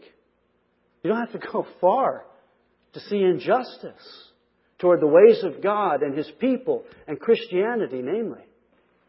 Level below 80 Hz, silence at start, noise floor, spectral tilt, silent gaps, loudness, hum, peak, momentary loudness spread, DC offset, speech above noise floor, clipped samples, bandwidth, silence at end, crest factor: -72 dBFS; 1.05 s; -68 dBFS; -10.5 dB/octave; none; -22 LUFS; none; -2 dBFS; 16 LU; under 0.1%; 46 dB; under 0.1%; 5.8 kHz; 0.75 s; 20 dB